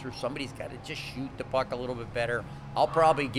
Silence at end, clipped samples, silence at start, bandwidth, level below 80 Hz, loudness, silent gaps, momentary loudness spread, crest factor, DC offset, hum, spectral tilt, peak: 0 s; under 0.1%; 0 s; 13.5 kHz; -52 dBFS; -31 LUFS; none; 14 LU; 20 dB; under 0.1%; none; -5.5 dB/octave; -10 dBFS